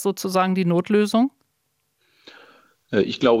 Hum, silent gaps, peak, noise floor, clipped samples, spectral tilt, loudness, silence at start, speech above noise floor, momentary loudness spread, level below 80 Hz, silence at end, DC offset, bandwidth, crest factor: none; none; -4 dBFS; -72 dBFS; under 0.1%; -6 dB/octave; -21 LUFS; 0 s; 52 dB; 5 LU; -64 dBFS; 0 s; under 0.1%; 16 kHz; 18 dB